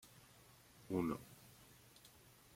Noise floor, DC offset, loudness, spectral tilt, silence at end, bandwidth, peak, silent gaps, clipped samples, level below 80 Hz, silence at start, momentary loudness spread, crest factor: -66 dBFS; under 0.1%; -43 LUFS; -6.5 dB/octave; 0.5 s; 16.5 kHz; -28 dBFS; none; under 0.1%; -74 dBFS; 0.05 s; 22 LU; 22 dB